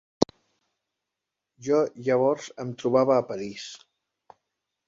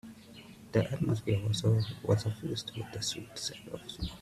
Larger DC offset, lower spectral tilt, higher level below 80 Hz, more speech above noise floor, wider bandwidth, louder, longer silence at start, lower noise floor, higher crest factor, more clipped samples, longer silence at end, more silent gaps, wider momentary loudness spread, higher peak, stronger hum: neither; about the same, -6 dB/octave vs -5.5 dB/octave; second, -64 dBFS vs -54 dBFS; first, 61 dB vs 19 dB; second, 7.8 kHz vs 14 kHz; first, -26 LUFS vs -33 LUFS; first, 0.2 s vs 0.05 s; first, -86 dBFS vs -52 dBFS; first, 26 dB vs 20 dB; neither; first, 1.1 s vs 0 s; neither; about the same, 16 LU vs 15 LU; first, -2 dBFS vs -14 dBFS; neither